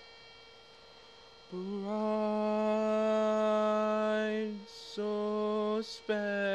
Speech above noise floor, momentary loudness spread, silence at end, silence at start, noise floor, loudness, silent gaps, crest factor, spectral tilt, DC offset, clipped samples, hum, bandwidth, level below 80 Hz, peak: 23 dB; 14 LU; 0 s; 0 s; -56 dBFS; -32 LUFS; none; 12 dB; -6 dB/octave; under 0.1%; under 0.1%; none; 9.6 kHz; -74 dBFS; -20 dBFS